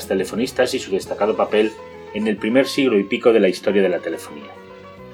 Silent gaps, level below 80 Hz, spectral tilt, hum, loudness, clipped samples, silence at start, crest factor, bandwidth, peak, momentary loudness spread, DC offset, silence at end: none; -56 dBFS; -5 dB/octave; none; -19 LUFS; under 0.1%; 0 s; 18 dB; 17.5 kHz; -2 dBFS; 20 LU; under 0.1%; 0 s